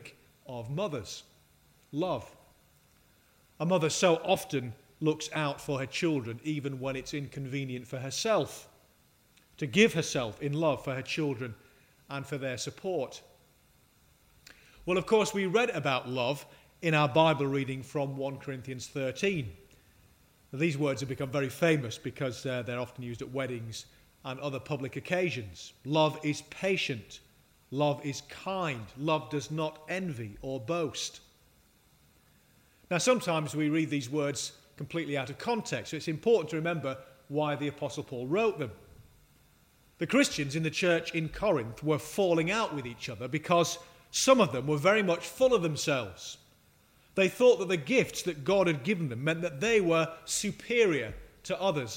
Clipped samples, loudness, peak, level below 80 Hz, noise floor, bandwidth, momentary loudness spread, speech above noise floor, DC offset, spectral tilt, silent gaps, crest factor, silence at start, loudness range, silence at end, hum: under 0.1%; -31 LUFS; -8 dBFS; -62 dBFS; -65 dBFS; 16 kHz; 13 LU; 35 dB; under 0.1%; -4.5 dB/octave; none; 24 dB; 0 s; 7 LU; 0 s; none